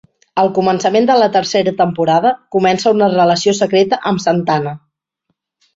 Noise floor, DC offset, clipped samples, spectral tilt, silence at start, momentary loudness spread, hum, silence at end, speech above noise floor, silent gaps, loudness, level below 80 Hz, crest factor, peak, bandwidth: -70 dBFS; under 0.1%; under 0.1%; -5 dB/octave; 0.35 s; 5 LU; none; 1 s; 57 dB; none; -14 LUFS; -56 dBFS; 12 dB; -2 dBFS; 8 kHz